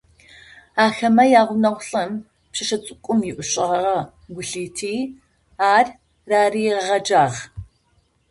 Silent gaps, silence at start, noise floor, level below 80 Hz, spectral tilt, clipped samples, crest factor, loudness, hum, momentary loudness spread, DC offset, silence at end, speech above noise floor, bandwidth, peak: none; 0.75 s; -63 dBFS; -54 dBFS; -4 dB/octave; under 0.1%; 18 dB; -19 LUFS; none; 15 LU; under 0.1%; 0.65 s; 44 dB; 11.5 kHz; -2 dBFS